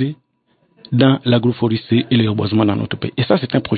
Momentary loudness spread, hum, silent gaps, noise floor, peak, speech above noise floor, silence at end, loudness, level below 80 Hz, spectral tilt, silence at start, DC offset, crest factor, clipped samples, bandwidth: 7 LU; none; none; -62 dBFS; 0 dBFS; 46 dB; 0 s; -17 LUFS; -52 dBFS; -12.5 dB/octave; 0 s; under 0.1%; 16 dB; under 0.1%; 4.8 kHz